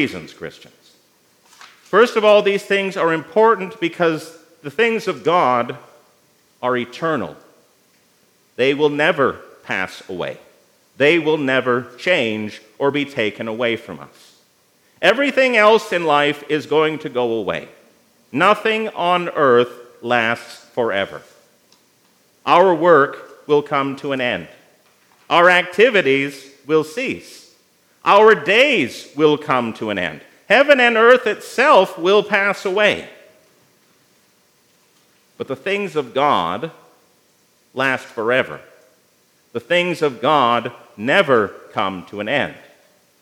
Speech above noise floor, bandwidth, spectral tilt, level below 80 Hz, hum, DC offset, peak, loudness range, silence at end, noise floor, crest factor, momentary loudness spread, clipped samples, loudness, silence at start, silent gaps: 41 dB; 16 kHz; -5 dB/octave; -70 dBFS; none; under 0.1%; 0 dBFS; 8 LU; 0.65 s; -58 dBFS; 18 dB; 15 LU; under 0.1%; -17 LUFS; 0 s; none